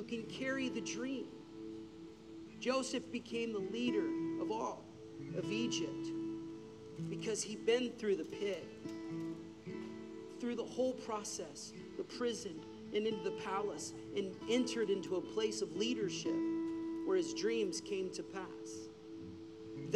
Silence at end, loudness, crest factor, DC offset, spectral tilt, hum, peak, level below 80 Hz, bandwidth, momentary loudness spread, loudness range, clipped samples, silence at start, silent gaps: 0 s; -40 LUFS; 18 dB; under 0.1%; -4 dB/octave; none; -22 dBFS; -76 dBFS; 12.5 kHz; 14 LU; 4 LU; under 0.1%; 0 s; none